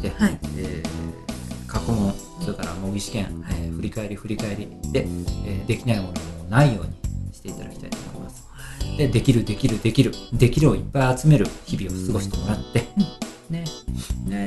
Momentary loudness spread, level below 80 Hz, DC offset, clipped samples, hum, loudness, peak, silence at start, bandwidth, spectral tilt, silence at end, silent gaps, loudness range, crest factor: 15 LU; -34 dBFS; under 0.1%; under 0.1%; none; -24 LUFS; -4 dBFS; 0 s; 12 kHz; -6.5 dB/octave; 0 s; none; 8 LU; 20 dB